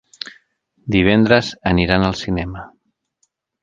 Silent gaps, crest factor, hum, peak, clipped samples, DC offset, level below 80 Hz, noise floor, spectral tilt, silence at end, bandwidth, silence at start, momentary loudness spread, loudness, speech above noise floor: none; 18 dB; none; 0 dBFS; under 0.1%; under 0.1%; -36 dBFS; -68 dBFS; -6.5 dB/octave; 0.95 s; 7.6 kHz; 0.85 s; 19 LU; -16 LUFS; 52 dB